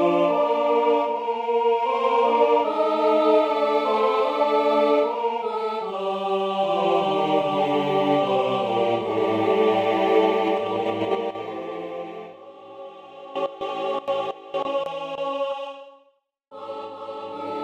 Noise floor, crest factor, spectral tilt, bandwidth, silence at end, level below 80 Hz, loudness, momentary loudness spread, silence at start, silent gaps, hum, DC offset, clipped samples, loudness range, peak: -63 dBFS; 16 dB; -6 dB/octave; 8.6 kHz; 0 s; -70 dBFS; -22 LUFS; 15 LU; 0 s; none; none; under 0.1%; under 0.1%; 10 LU; -6 dBFS